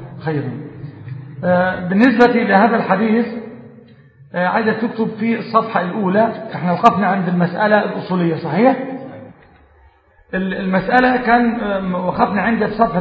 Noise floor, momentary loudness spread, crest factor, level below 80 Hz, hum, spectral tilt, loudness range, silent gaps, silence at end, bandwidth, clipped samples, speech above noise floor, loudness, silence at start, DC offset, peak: -50 dBFS; 15 LU; 16 dB; -50 dBFS; none; -8.5 dB/octave; 3 LU; none; 0 s; 7.2 kHz; under 0.1%; 35 dB; -16 LUFS; 0 s; under 0.1%; 0 dBFS